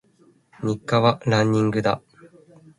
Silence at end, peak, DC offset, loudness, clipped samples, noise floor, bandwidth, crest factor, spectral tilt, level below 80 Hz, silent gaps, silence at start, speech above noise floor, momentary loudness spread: 0.8 s; -4 dBFS; under 0.1%; -22 LUFS; under 0.1%; -58 dBFS; 11.5 kHz; 20 dB; -6.5 dB/octave; -56 dBFS; none; 0.6 s; 38 dB; 10 LU